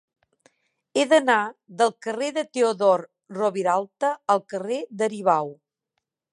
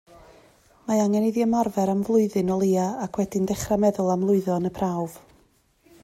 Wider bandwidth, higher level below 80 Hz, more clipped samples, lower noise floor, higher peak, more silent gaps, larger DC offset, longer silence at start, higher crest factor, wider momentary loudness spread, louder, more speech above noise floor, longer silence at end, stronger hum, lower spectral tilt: second, 11 kHz vs 15 kHz; second, -82 dBFS vs -54 dBFS; neither; first, -81 dBFS vs -62 dBFS; about the same, -6 dBFS vs -8 dBFS; neither; neither; about the same, 0.95 s vs 0.85 s; about the same, 18 dB vs 16 dB; first, 10 LU vs 6 LU; about the same, -23 LUFS vs -23 LUFS; first, 58 dB vs 39 dB; about the same, 0.8 s vs 0.85 s; neither; second, -4 dB/octave vs -7 dB/octave